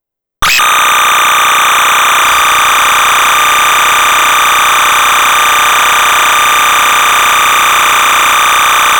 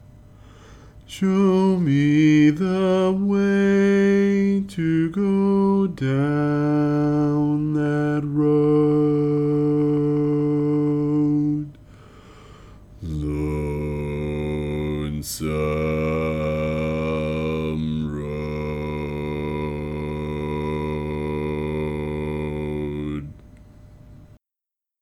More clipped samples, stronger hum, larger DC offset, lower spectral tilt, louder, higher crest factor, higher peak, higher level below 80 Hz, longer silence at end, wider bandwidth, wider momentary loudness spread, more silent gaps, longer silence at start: neither; neither; neither; second, 1 dB/octave vs -8 dB/octave; first, -6 LUFS vs -22 LUFS; second, 6 dB vs 14 dB; first, 0 dBFS vs -8 dBFS; about the same, -38 dBFS vs -40 dBFS; second, 0 s vs 0.75 s; first, over 20 kHz vs 13.5 kHz; second, 0 LU vs 10 LU; neither; first, 0.4 s vs 0.1 s